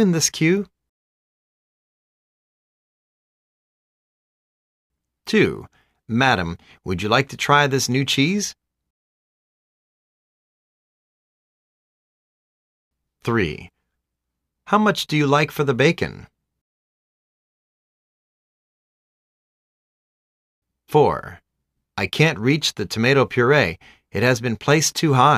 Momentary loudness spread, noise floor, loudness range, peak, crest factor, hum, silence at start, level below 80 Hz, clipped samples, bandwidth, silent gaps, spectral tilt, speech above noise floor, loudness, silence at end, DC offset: 13 LU; -80 dBFS; 11 LU; -2 dBFS; 20 dB; none; 0 s; -54 dBFS; under 0.1%; 15.5 kHz; 0.89-4.90 s, 8.90-12.91 s, 16.61-20.62 s; -4.5 dB/octave; 62 dB; -19 LUFS; 0 s; under 0.1%